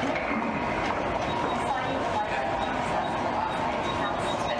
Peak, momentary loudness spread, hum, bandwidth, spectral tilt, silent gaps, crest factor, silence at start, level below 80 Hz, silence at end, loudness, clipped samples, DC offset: -16 dBFS; 0 LU; none; 13 kHz; -5 dB/octave; none; 12 dB; 0 s; -48 dBFS; 0 s; -28 LUFS; under 0.1%; under 0.1%